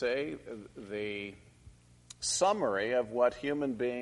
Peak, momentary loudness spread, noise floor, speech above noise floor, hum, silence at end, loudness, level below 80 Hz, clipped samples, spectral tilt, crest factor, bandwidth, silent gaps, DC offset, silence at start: -14 dBFS; 16 LU; -58 dBFS; 25 dB; 60 Hz at -65 dBFS; 0 s; -32 LUFS; -64 dBFS; under 0.1%; -3 dB/octave; 18 dB; 11.5 kHz; none; under 0.1%; 0 s